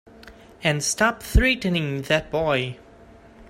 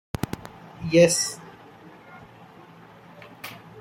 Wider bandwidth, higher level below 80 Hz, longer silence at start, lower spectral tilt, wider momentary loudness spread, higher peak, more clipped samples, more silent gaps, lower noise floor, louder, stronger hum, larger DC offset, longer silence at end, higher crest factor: about the same, 16 kHz vs 16.5 kHz; first, -30 dBFS vs -56 dBFS; about the same, 0.25 s vs 0.35 s; about the same, -4 dB/octave vs -4 dB/octave; second, 6 LU vs 28 LU; about the same, -4 dBFS vs -6 dBFS; neither; neither; about the same, -48 dBFS vs -48 dBFS; about the same, -22 LUFS vs -22 LUFS; neither; neither; about the same, 0.05 s vs 0 s; about the same, 20 dB vs 22 dB